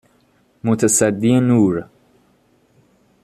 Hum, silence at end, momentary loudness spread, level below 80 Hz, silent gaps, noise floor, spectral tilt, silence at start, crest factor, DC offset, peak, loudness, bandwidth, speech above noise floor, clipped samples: none; 1.4 s; 10 LU; -56 dBFS; none; -58 dBFS; -5.5 dB/octave; 0.65 s; 16 dB; under 0.1%; -2 dBFS; -16 LUFS; 13.5 kHz; 43 dB; under 0.1%